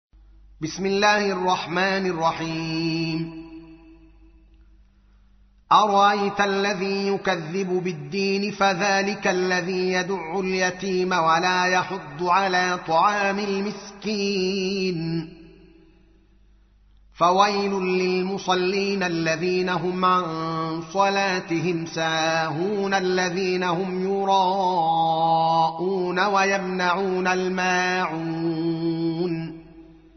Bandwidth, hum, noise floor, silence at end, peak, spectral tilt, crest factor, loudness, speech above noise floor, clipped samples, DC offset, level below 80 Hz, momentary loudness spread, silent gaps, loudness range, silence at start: 6.4 kHz; none; -55 dBFS; 0.25 s; -4 dBFS; -3.5 dB/octave; 20 dB; -22 LUFS; 33 dB; under 0.1%; under 0.1%; -58 dBFS; 8 LU; none; 5 LU; 0.6 s